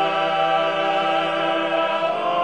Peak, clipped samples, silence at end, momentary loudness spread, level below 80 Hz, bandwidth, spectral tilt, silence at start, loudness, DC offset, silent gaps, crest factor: -8 dBFS; under 0.1%; 0 s; 2 LU; -66 dBFS; 9.8 kHz; -4.5 dB/octave; 0 s; -20 LUFS; 0.2%; none; 12 dB